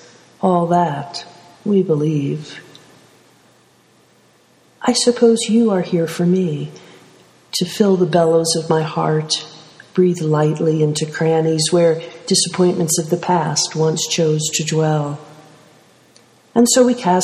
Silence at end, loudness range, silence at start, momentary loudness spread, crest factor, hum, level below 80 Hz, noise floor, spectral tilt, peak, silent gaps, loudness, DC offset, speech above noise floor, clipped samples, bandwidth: 0 s; 6 LU; 0.4 s; 10 LU; 16 dB; none; -62 dBFS; -53 dBFS; -5 dB/octave; 0 dBFS; none; -17 LUFS; under 0.1%; 37 dB; under 0.1%; 14.5 kHz